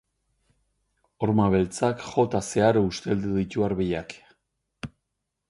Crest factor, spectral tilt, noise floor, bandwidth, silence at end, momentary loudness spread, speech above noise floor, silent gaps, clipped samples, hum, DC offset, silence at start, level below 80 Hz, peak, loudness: 18 dB; -6.5 dB/octave; -81 dBFS; 11.5 kHz; 0.6 s; 20 LU; 57 dB; none; under 0.1%; none; under 0.1%; 1.2 s; -50 dBFS; -8 dBFS; -25 LUFS